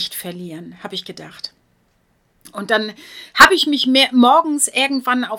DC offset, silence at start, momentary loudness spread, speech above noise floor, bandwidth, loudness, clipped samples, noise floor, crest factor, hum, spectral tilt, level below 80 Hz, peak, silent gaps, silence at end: under 0.1%; 0 s; 23 LU; 45 dB; 19 kHz; -14 LUFS; 0.3%; -61 dBFS; 18 dB; none; -2 dB/octave; -54 dBFS; 0 dBFS; none; 0 s